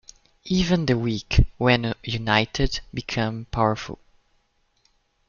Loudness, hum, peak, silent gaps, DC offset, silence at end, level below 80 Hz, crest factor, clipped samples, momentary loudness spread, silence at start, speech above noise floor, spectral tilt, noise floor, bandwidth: -23 LUFS; none; -2 dBFS; none; under 0.1%; 1.35 s; -34 dBFS; 22 dB; under 0.1%; 10 LU; 0.45 s; 44 dB; -5.5 dB/octave; -67 dBFS; 7.2 kHz